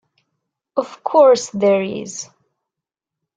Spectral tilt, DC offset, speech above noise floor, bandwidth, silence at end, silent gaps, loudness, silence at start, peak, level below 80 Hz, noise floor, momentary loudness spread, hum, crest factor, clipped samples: -4.5 dB/octave; under 0.1%; 69 dB; 9.4 kHz; 1.1 s; none; -17 LUFS; 0.75 s; -2 dBFS; -68 dBFS; -85 dBFS; 18 LU; none; 18 dB; under 0.1%